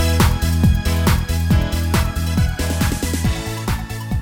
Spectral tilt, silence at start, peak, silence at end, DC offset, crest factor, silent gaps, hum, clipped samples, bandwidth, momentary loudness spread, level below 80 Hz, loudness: -5.5 dB/octave; 0 s; -2 dBFS; 0 s; under 0.1%; 16 dB; none; none; under 0.1%; 18 kHz; 7 LU; -22 dBFS; -19 LUFS